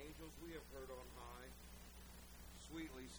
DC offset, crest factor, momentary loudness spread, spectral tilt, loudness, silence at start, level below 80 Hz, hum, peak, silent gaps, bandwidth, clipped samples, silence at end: under 0.1%; 16 dB; 7 LU; -4 dB/octave; -56 LUFS; 0 s; -62 dBFS; 60 Hz at -60 dBFS; -40 dBFS; none; over 20 kHz; under 0.1%; 0 s